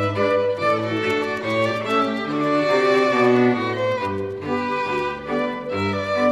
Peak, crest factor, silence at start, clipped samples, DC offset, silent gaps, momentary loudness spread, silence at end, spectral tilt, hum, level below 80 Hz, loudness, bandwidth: -6 dBFS; 16 dB; 0 s; under 0.1%; under 0.1%; none; 8 LU; 0 s; -6 dB/octave; none; -58 dBFS; -21 LUFS; 12.5 kHz